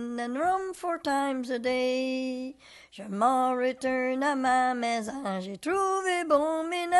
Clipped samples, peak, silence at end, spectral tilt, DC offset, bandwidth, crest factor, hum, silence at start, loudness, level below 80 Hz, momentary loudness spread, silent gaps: under 0.1%; -12 dBFS; 0 s; -4 dB/octave; under 0.1%; 12.5 kHz; 16 dB; none; 0 s; -28 LUFS; -66 dBFS; 9 LU; none